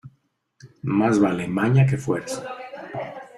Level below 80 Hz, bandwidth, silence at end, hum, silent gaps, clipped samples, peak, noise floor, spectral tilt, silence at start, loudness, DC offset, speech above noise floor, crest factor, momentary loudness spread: -58 dBFS; 12 kHz; 0 s; none; none; under 0.1%; -6 dBFS; -67 dBFS; -7.5 dB/octave; 0.05 s; -22 LUFS; under 0.1%; 46 dB; 18 dB; 15 LU